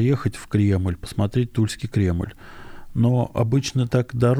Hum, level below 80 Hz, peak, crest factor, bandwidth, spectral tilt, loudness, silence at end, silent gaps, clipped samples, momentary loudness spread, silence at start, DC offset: none; -42 dBFS; -6 dBFS; 14 dB; 13.5 kHz; -7 dB/octave; -22 LUFS; 0 s; none; under 0.1%; 9 LU; 0 s; under 0.1%